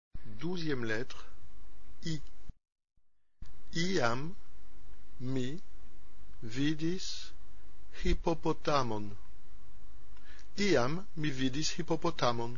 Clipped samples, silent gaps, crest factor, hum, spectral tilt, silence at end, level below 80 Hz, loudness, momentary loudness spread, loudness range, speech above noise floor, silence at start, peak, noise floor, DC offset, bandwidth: under 0.1%; none; 20 dB; none; -4.5 dB/octave; 0 s; -46 dBFS; -35 LUFS; 20 LU; 6 LU; 21 dB; 0.1 s; -16 dBFS; -54 dBFS; 3%; 7.2 kHz